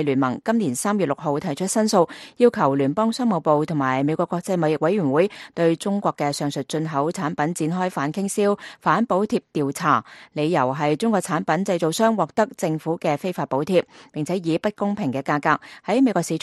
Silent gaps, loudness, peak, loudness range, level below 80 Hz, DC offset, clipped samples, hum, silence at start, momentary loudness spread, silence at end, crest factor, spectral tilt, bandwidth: none; -22 LUFS; -4 dBFS; 3 LU; -66 dBFS; under 0.1%; under 0.1%; none; 0 s; 5 LU; 0.05 s; 18 dB; -5.5 dB/octave; 12.5 kHz